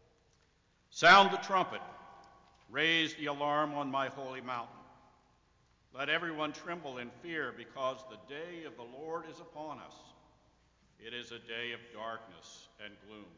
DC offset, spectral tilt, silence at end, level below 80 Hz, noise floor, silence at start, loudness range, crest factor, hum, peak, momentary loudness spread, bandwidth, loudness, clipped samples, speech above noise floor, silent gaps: under 0.1%; -3.5 dB/octave; 0.1 s; -74 dBFS; -71 dBFS; 0.9 s; 16 LU; 24 dB; none; -12 dBFS; 22 LU; 7.6 kHz; -32 LUFS; under 0.1%; 37 dB; none